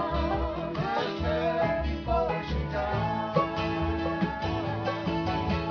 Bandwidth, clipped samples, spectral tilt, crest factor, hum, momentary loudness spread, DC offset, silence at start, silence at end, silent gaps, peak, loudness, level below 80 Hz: 5.4 kHz; under 0.1%; -7.5 dB/octave; 18 dB; none; 3 LU; under 0.1%; 0 s; 0 s; none; -10 dBFS; -29 LUFS; -38 dBFS